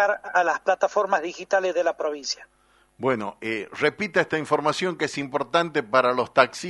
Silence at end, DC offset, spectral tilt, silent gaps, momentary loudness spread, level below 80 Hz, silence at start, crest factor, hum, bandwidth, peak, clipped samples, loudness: 0 s; under 0.1%; -4 dB/octave; none; 8 LU; -68 dBFS; 0 s; 22 dB; none; 11.5 kHz; -2 dBFS; under 0.1%; -24 LUFS